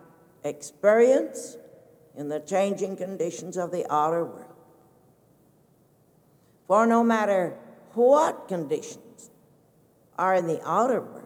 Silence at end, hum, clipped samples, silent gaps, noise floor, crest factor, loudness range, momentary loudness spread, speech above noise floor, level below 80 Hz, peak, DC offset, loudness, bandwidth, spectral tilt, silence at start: 0 s; none; under 0.1%; none; -61 dBFS; 20 dB; 7 LU; 18 LU; 37 dB; -80 dBFS; -8 dBFS; under 0.1%; -25 LUFS; 16.5 kHz; -5.5 dB/octave; 0.45 s